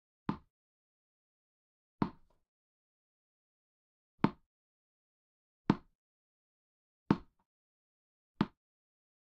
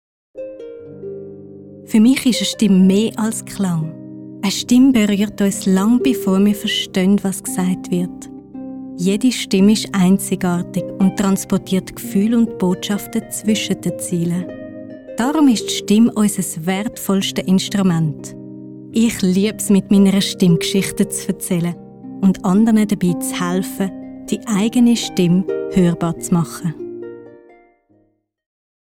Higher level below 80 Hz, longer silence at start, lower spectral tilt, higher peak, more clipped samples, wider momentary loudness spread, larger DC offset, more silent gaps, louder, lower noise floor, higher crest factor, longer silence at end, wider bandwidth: second, -68 dBFS vs -50 dBFS; about the same, 0.3 s vs 0.35 s; first, -7 dB/octave vs -5.5 dB/octave; second, -12 dBFS vs -2 dBFS; neither; second, 7 LU vs 19 LU; neither; first, 0.50-1.98 s, 2.48-4.18 s, 4.46-5.65 s, 5.95-7.06 s, 7.46-8.35 s vs none; second, -38 LUFS vs -17 LUFS; first, under -90 dBFS vs -61 dBFS; first, 32 dB vs 14 dB; second, 0.85 s vs 1.65 s; second, 7 kHz vs 17 kHz